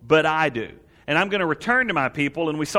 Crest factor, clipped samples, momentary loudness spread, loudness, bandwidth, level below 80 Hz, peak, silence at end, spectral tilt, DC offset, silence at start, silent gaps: 18 dB; under 0.1%; 11 LU; -21 LUFS; 15 kHz; -56 dBFS; -4 dBFS; 0 s; -5 dB/octave; under 0.1%; 0.05 s; none